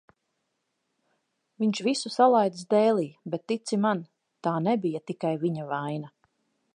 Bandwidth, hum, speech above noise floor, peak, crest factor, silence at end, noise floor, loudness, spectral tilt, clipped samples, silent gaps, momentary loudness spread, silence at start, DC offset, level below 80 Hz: 10.5 kHz; none; 53 dB; -8 dBFS; 20 dB; 0.65 s; -79 dBFS; -27 LUFS; -6 dB/octave; under 0.1%; none; 12 LU; 1.6 s; under 0.1%; -80 dBFS